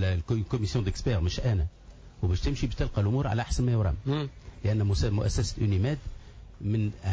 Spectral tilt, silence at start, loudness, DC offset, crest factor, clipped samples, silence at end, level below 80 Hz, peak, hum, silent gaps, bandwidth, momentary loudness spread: -6.5 dB/octave; 0 s; -29 LUFS; under 0.1%; 10 dB; under 0.1%; 0 s; -36 dBFS; -18 dBFS; none; none; 8 kHz; 7 LU